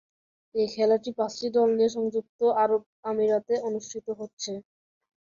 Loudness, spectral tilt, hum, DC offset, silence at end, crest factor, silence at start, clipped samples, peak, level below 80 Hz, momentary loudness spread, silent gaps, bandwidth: -27 LUFS; -4.5 dB/octave; none; under 0.1%; 0.6 s; 16 dB; 0.55 s; under 0.1%; -12 dBFS; -70 dBFS; 12 LU; 2.29-2.39 s, 2.86-3.03 s, 4.33-4.37 s; 7.4 kHz